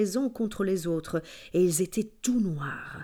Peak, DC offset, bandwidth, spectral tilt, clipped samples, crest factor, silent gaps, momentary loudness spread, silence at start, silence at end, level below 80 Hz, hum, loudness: -12 dBFS; under 0.1%; 19 kHz; -5.5 dB/octave; under 0.1%; 16 dB; none; 9 LU; 0 s; 0 s; -56 dBFS; none; -29 LUFS